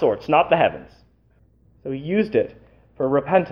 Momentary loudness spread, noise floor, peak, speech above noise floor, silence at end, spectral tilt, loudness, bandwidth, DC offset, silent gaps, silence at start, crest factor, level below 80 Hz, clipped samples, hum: 14 LU; -58 dBFS; -2 dBFS; 38 dB; 0 s; -8.5 dB/octave; -21 LUFS; 6.4 kHz; under 0.1%; none; 0 s; 20 dB; -54 dBFS; under 0.1%; none